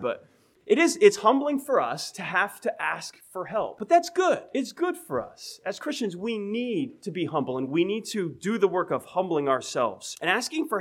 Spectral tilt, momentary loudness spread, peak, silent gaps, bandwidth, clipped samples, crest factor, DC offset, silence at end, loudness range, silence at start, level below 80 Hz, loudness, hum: -4 dB/octave; 10 LU; -4 dBFS; none; 16 kHz; under 0.1%; 22 dB; under 0.1%; 0 s; 5 LU; 0 s; -72 dBFS; -26 LUFS; none